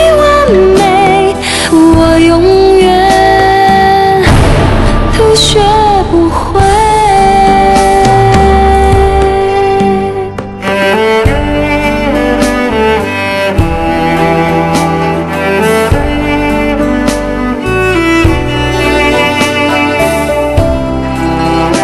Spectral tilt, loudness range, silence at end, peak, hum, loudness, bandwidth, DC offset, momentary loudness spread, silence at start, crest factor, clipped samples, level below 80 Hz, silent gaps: -5.5 dB/octave; 4 LU; 0 s; 0 dBFS; none; -8 LUFS; 13 kHz; under 0.1%; 6 LU; 0 s; 8 dB; 1%; -18 dBFS; none